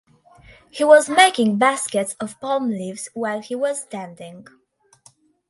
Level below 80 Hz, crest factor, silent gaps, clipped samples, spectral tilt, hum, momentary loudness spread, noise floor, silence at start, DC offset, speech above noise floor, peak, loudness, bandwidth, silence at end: -64 dBFS; 20 dB; none; under 0.1%; -3 dB/octave; none; 20 LU; -55 dBFS; 0.75 s; under 0.1%; 36 dB; 0 dBFS; -19 LUFS; 11.5 kHz; 1.1 s